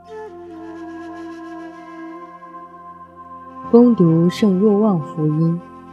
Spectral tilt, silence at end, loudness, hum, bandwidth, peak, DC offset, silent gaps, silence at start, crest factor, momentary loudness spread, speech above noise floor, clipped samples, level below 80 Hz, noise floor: -9 dB/octave; 0.15 s; -16 LUFS; none; 9 kHz; 0 dBFS; under 0.1%; none; 0.1 s; 18 dB; 24 LU; 25 dB; under 0.1%; -62 dBFS; -39 dBFS